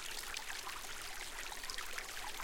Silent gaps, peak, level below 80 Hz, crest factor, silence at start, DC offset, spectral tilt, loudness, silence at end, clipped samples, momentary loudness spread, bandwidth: none; -22 dBFS; -54 dBFS; 22 dB; 0 s; under 0.1%; 0 dB/octave; -43 LUFS; 0 s; under 0.1%; 2 LU; 17 kHz